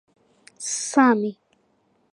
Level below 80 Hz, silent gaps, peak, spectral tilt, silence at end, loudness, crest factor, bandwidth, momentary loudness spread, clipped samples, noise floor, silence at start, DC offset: -82 dBFS; none; -4 dBFS; -3.5 dB/octave; 0.8 s; -21 LUFS; 20 dB; 11.5 kHz; 13 LU; under 0.1%; -66 dBFS; 0.6 s; under 0.1%